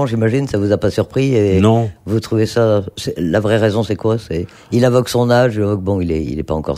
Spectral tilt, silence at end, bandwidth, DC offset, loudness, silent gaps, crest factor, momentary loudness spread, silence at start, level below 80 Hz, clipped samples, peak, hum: -7 dB/octave; 0 s; 15 kHz; under 0.1%; -16 LUFS; none; 14 dB; 8 LU; 0 s; -38 dBFS; under 0.1%; 0 dBFS; none